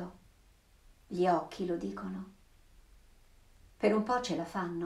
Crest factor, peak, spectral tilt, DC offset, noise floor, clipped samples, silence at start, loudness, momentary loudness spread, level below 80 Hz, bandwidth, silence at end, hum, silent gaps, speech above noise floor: 22 dB; -14 dBFS; -6 dB/octave; under 0.1%; -64 dBFS; under 0.1%; 0 s; -34 LUFS; 14 LU; -62 dBFS; 14 kHz; 0 s; none; none; 31 dB